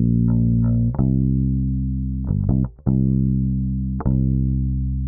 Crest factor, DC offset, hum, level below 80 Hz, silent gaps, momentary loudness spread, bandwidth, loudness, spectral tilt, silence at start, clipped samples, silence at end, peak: 14 dB; under 0.1%; none; -26 dBFS; none; 5 LU; 1.7 kHz; -21 LUFS; -17 dB/octave; 0 s; under 0.1%; 0 s; -6 dBFS